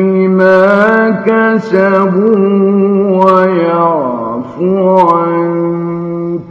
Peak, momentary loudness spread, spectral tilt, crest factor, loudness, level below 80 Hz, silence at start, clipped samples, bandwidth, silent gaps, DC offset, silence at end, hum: 0 dBFS; 9 LU; -9 dB/octave; 10 dB; -10 LUFS; -54 dBFS; 0 s; 0.8%; 6.6 kHz; none; under 0.1%; 0 s; none